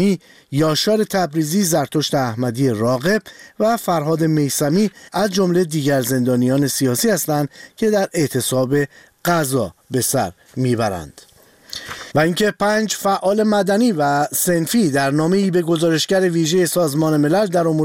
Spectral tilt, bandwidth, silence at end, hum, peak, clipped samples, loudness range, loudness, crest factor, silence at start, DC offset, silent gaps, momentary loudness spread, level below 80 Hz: -5 dB/octave; 17 kHz; 0 s; none; -2 dBFS; under 0.1%; 4 LU; -18 LUFS; 14 dB; 0 s; 0.1%; none; 6 LU; -54 dBFS